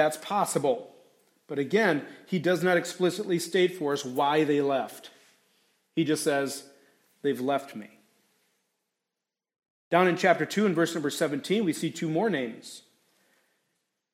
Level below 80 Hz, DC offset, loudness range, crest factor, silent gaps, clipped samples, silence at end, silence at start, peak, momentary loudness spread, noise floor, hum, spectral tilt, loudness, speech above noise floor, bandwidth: -80 dBFS; under 0.1%; 5 LU; 20 dB; 9.70-9.91 s; under 0.1%; 1.35 s; 0 s; -8 dBFS; 12 LU; -88 dBFS; none; -5 dB/octave; -27 LUFS; 62 dB; 16 kHz